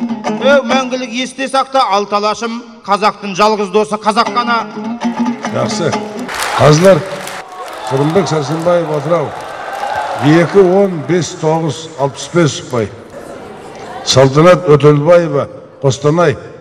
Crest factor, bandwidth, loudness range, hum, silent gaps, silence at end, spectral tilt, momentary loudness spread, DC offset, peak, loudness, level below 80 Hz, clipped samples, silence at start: 12 dB; 14.5 kHz; 4 LU; none; none; 0.05 s; -5.5 dB/octave; 15 LU; under 0.1%; 0 dBFS; -12 LUFS; -48 dBFS; 0.1%; 0 s